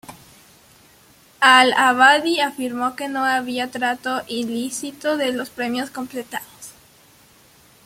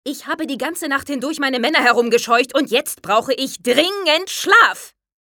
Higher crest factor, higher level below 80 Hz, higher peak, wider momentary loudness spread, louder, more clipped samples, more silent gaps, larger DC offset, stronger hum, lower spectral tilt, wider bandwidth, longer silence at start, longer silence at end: about the same, 20 dB vs 18 dB; about the same, -66 dBFS vs -64 dBFS; about the same, -2 dBFS vs 0 dBFS; first, 17 LU vs 11 LU; about the same, -19 LUFS vs -17 LUFS; neither; neither; neither; neither; about the same, -2 dB/octave vs -1.5 dB/octave; about the same, 16.5 kHz vs 18 kHz; about the same, 0.1 s vs 0.05 s; first, 1.15 s vs 0.4 s